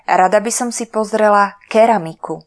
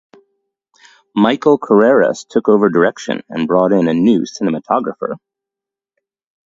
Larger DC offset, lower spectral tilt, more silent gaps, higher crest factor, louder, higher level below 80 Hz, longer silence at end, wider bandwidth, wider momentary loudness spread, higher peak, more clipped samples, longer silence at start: neither; second, -4 dB/octave vs -6.5 dB/octave; neither; about the same, 14 dB vs 16 dB; about the same, -14 LUFS vs -14 LUFS; about the same, -62 dBFS vs -60 dBFS; second, 0.05 s vs 1.3 s; first, 11 kHz vs 7.8 kHz; second, 7 LU vs 12 LU; about the same, 0 dBFS vs 0 dBFS; neither; second, 0.1 s vs 1.15 s